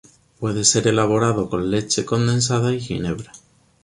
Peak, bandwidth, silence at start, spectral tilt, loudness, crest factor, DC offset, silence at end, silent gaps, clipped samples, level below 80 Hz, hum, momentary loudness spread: -2 dBFS; 11.5 kHz; 0.4 s; -4.5 dB/octave; -20 LUFS; 18 dB; under 0.1%; 0.45 s; none; under 0.1%; -48 dBFS; none; 11 LU